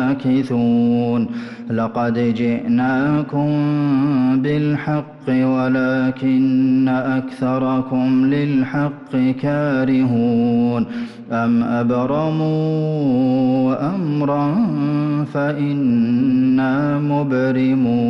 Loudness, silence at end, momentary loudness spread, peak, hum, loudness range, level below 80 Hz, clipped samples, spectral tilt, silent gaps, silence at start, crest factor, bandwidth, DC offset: -18 LUFS; 0 s; 5 LU; -10 dBFS; none; 1 LU; -54 dBFS; under 0.1%; -9.5 dB/octave; none; 0 s; 8 dB; 6 kHz; under 0.1%